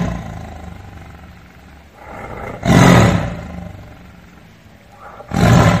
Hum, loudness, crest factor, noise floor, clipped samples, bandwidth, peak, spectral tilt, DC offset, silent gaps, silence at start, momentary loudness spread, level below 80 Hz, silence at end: none; -13 LUFS; 16 dB; -43 dBFS; 0.1%; 15.5 kHz; 0 dBFS; -6 dB/octave; 0.2%; none; 0 s; 27 LU; -32 dBFS; 0 s